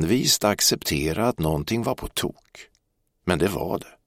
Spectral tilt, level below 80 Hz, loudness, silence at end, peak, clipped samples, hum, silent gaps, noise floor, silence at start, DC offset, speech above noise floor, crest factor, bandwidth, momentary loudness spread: -3.5 dB/octave; -44 dBFS; -23 LUFS; 0.15 s; -4 dBFS; under 0.1%; none; none; -71 dBFS; 0 s; under 0.1%; 47 dB; 20 dB; 16.5 kHz; 10 LU